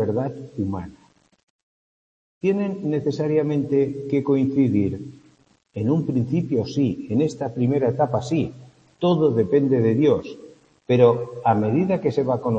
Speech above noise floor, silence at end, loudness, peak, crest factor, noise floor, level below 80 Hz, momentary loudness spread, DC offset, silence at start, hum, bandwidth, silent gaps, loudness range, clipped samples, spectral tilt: 37 dB; 0 s; -22 LUFS; -2 dBFS; 20 dB; -58 dBFS; -58 dBFS; 10 LU; under 0.1%; 0 s; none; 8.4 kHz; 1.43-2.41 s; 5 LU; under 0.1%; -8.5 dB/octave